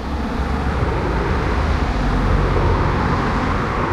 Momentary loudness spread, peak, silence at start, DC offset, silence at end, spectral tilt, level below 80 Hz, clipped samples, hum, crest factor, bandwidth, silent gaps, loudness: 4 LU; -6 dBFS; 0 s; under 0.1%; 0 s; -7 dB/octave; -22 dBFS; under 0.1%; none; 12 dB; 10.5 kHz; none; -20 LUFS